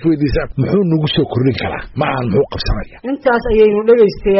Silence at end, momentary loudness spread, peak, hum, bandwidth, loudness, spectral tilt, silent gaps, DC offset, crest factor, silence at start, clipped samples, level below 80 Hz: 0 s; 10 LU; 0 dBFS; none; 6 kHz; -15 LUFS; -5.5 dB/octave; none; under 0.1%; 12 dB; 0 s; under 0.1%; -28 dBFS